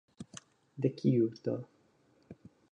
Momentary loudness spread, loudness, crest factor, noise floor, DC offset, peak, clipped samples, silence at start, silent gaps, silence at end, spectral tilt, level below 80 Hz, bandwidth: 26 LU; -33 LUFS; 20 dB; -68 dBFS; under 0.1%; -16 dBFS; under 0.1%; 0.2 s; none; 0.4 s; -8 dB/octave; -76 dBFS; 10 kHz